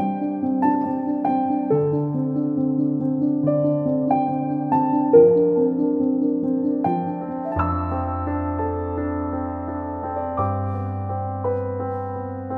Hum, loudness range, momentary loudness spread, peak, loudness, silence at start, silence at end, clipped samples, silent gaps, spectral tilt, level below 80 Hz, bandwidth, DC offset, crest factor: none; 7 LU; 8 LU; -2 dBFS; -22 LUFS; 0 s; 0 s; under 0.1%; none; -12.5 dB/octave; -46 dBFS; 3.4 kHz; under 0.1%; 18 dB